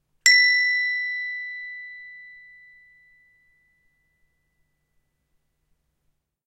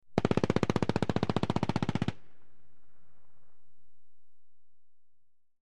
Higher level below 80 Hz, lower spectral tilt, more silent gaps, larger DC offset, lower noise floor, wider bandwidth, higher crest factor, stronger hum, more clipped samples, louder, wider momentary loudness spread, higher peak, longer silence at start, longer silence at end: second, -74 dBFS vs -56 dBFS; second, 6.5 dB/octave vs -7 dB/octave; neither; second, under 0.1% vs 1%; about the same, -73 dBFS vs -75 dBFS; first, 15.5 kHz vs 11.5 kHz; about the same, 26 dB vs 28 dB; neither; neither; first, -19 LUFS vs -31 LUFS; first, 25 LU vs 4 LU; first, 0 dBFS vs -8 dBFS; first, 0.25 s vs 0 s; first, 4.1 s vs 0 s